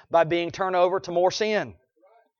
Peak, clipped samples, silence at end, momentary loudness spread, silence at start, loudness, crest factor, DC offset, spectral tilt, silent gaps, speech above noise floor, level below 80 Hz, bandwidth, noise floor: -8 dBFS; under 0.1%; 0.7 s; 5 LU; 0.1 s; -24 LUFS; 18 dB; under 0.1%; -4.5 dB/octave; none; 37 dB; -64 dBFS; 7.2 kHz; -61 dBFS